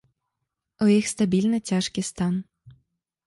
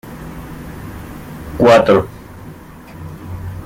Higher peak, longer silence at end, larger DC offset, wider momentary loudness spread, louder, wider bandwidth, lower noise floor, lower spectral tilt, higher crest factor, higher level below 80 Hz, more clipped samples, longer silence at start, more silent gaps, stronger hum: second, -8 dBFS vs -2 dBFS; first, 0.55 s vs 0 s; neither; second, 7 LU vs 25 LU; second, -24 LUFS vs -11 LUFS; second, 11.5 kHz vs 17 kHz; first, -82 dBFS vs -35 dBFS; about the same, -5.5 dB/octave vs -6.5 dB/octave; about the same, 16 dB vs 16 dB; second, -60 dBFS vs -38 dBFS; neither; first, 0.8 s vs 0.05 s; neither; neither